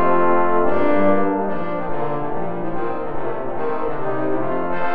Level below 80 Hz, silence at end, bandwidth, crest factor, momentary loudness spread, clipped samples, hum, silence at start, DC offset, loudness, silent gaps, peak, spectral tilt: -42 dBFS; 0 s; 5.2 kHz; 16 dB; 9 LU; under 0.1%; none; 0 s; 9%; -22 LUFS; none; -4 dBFS; -10 dB/octave